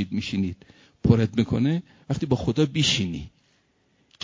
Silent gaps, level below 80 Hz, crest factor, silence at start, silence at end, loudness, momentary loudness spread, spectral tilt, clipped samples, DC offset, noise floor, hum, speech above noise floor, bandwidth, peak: none; -44 dBFS; 22 dB; 0 s; 0.95 s; -24 LUFS; 11 LU; -5.5 dB/octave; under 0.1%; under 0.1%; -66 dBFS; none; 42 dB; 7.6 kHz; -4 dBFS